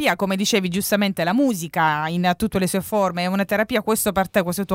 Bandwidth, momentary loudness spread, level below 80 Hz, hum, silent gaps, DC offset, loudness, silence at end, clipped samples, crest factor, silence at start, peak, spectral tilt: 16.5 kHz; 2 LU; -50 dBFS; none; none; under 0.1%; -21 LUFS; 0 s; under 0.1%; 16 dB; 0 s; -4 dBFS; -4.5 dB/octave